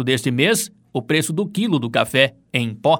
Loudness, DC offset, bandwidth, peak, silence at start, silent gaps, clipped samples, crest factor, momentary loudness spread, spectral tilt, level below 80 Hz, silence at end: -19 LUFS; under 0.1%; 19.5 kHz; 0 dBFS; 0 s; none; under 0.1%; 20 dB; 6 LU; -4.5 dB/octave; -60 dBFS; 0 s